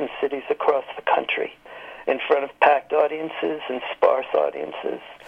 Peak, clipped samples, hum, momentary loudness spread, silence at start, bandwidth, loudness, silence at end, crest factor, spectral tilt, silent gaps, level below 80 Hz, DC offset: -2 dBFS; under 0.1%; none; 12 LU; 0 s; 5.8 kHz; -23 LUFS; 0 s; 20 dB; -5.5 dB/octave; none; -68 dBFS; under 0.1%